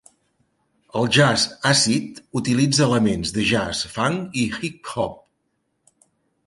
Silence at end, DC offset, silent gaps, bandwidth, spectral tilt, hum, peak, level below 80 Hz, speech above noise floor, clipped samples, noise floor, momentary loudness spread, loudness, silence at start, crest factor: 1.3 s; under 0.1%; none; 11.5 kHz; -4 dB/octave; none; -2 dBFS; -50 dBFS; 52 dB; under 0.1%; -72 dBFS; 11 LU; -20 LUFS; 0.95 s; 20 dB